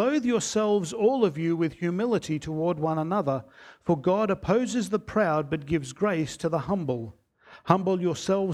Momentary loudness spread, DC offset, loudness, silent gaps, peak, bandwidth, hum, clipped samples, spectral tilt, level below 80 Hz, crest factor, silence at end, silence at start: 6 LU; under 0.1%; -26 LUFS; none; -4 dBFS; 13.5 kHz; none; under 0.1%; -6 dB/octave; -56 dBFS; 22 dB; 0 s; 0 s